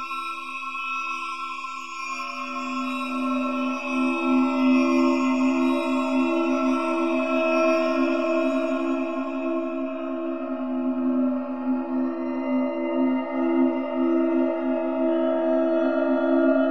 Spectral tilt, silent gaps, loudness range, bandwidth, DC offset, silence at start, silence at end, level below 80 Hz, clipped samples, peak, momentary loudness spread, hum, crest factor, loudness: -4.5 dB/octave; none; 5 LU; 9 kHz; 0.6%; 0 s; 0 s; -68 dBFS; under 0.1%; -10 dBFS; 9 LU; none; 14 dB; -24 LUFS